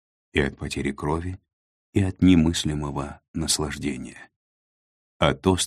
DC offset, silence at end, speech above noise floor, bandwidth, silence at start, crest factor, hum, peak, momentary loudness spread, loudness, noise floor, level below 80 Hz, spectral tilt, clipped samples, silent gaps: under 0.1%; 0 s; over 67 dB; 14.5 kHz; 0.35 s; 24 dB; none; -2 dBFS; 15 LU; -24 LUFS; under -90 dBFS; -42 dBFS; -5 dB/octave; under 0.1%; 1.53-1.93 s, 3.28-3.34 s, 4.36-5.20 s